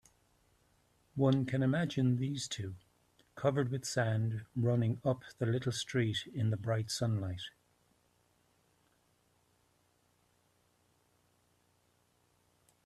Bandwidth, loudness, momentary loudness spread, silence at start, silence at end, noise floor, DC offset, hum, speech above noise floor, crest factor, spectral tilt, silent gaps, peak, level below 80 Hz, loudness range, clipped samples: 12.5 kHz; -34 LUFS; 10 LU; 1.15 s; 5.35 s; -74 dBFS; under 0.1%; none; 40 dB; 20 dB; -6 dB/octave; none; -18 dBFS; -70 dBFS; 7 LU; under 0.1%